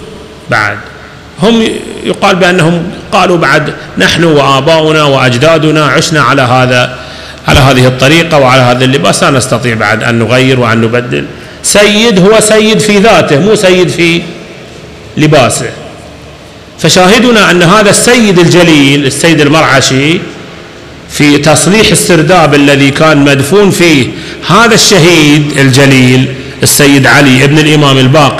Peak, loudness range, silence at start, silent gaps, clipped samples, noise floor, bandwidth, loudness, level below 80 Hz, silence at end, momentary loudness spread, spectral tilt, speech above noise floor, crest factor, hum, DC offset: 0 dBFS; 4 LU; 0 s; none; 5%; -29 dBFS; 16 kHz; -5 LUFS; -32 dBFS; 0 s; 10 LU; -4.5 dB/octave; 24 dB; 6 dB; none; under 0.1%